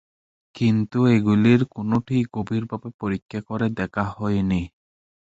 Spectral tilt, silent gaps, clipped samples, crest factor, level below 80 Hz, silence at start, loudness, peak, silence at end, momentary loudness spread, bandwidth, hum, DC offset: -8.5 dB/octave; 2.94-2.99 s, 3.22-3.29 s; under 0.1%; 18 dB; -48 dBFS; 0.55 s; -22 LUFS; -4 dBFS; 0.6 s; 12 LU; 8 kHz; none; under 0.1%